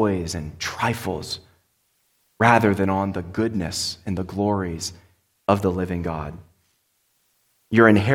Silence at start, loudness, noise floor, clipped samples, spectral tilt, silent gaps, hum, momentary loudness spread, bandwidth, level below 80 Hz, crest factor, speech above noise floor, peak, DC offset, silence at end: 0 s; -23 LUFS; -68 dBFS; under 0.1%; -5.5 dB/octave; none; none; 14 LU; 17 kHz; -48 dBFS; 22 dB; 47 dB; 0 dBFS; under 0.1%; 0 s